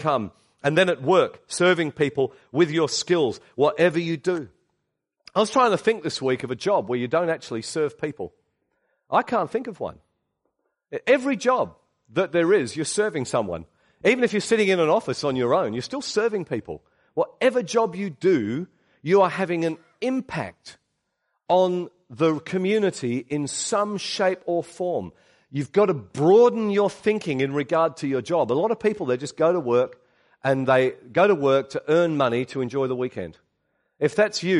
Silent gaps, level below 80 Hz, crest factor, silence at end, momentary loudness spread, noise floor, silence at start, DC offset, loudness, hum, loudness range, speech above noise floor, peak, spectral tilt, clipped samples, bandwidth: none; -64 dBFS; 16 dB; 0 s; 11 LU; -77 dBFS; 0 s; under 0.1%; -23 LUFS; none; 4 LU; 55 dB; -6 dBFS; -5 dB/octave; under 0.1%; 11.5 kHz